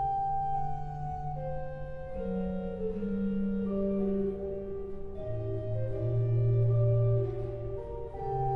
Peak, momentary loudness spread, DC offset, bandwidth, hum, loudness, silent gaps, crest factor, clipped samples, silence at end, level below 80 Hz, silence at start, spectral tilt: -18 dBFS; 13 LU; under 0.1%; 3.6 kHz; none; -33 LUFS; none; 14 dB; under 0.1%; 0 s; -44 dBFS; 0 s; -11.5 dB/octave